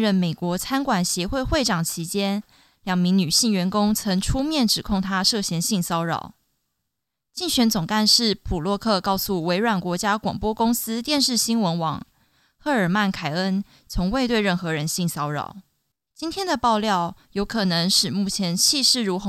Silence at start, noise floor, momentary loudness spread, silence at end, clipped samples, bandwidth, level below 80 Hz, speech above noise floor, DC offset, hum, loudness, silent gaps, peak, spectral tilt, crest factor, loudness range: 0 s; -82 dBFS; 10 LU; 0 s; under 0.1%; 16 kHz; -42 dBFS; 60 dB; under 0.1%; none; -22 LUFS; none; -4 dBFS; -3.5 dB/octave; 18 dB; 3 LU